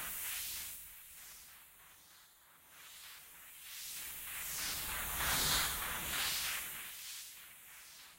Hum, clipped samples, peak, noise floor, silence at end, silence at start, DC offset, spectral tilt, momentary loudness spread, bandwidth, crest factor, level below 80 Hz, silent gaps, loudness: none; under 0.1%; -22 dBFS; -63 dBFS; 0 s; 0 s; under 0.1%; 0 dB/octave; 22 LU; 16 kHz; 20 dB; -58 dBFS; none; -37 LUFS